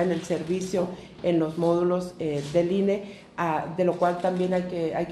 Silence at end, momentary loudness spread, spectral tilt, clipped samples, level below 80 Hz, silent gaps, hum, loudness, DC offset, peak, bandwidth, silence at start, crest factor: 0 s; 6 LU; -7 dB/octave; under 0.1%; -58 dBFS; none; none; -26 LUFS; under 0.1%; -10 dBFS; 12.5 kHz; 0 s; 16 dB